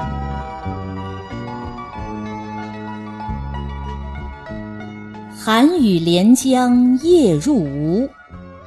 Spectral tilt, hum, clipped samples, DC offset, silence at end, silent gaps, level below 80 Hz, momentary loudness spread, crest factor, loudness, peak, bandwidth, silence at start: -6 dB/octave; none; under 0.1%; under 0.1%; 0 s; none; -36 dBFS; 18 LU; 16 dB; -18 LUFS; -2 dBFS; 12.5 kHz; 0 s